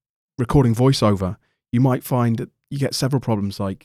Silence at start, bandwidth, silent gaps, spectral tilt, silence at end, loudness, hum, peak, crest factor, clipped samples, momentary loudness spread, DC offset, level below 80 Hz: 0.4 s; 15 kHz; none; -6.5 dB/octave; 0.1 s; -20 LUFS; none; -4 dBFS; 16 dB; under 0.1%; 12 LU; under 0.1%; -42 dBFS